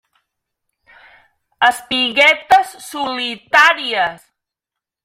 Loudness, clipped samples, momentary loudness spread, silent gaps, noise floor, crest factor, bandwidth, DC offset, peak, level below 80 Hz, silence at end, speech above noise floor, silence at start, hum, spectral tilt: -14 LUFS; under 0.1%; 12 LU; none; -85 dBFS; 18 dB; 16.5 kHz; under 0.1%; 0 dBFS; -58 dBFS; 0.9 s; 70 dB; 1.6 s; none; -1 dB/octave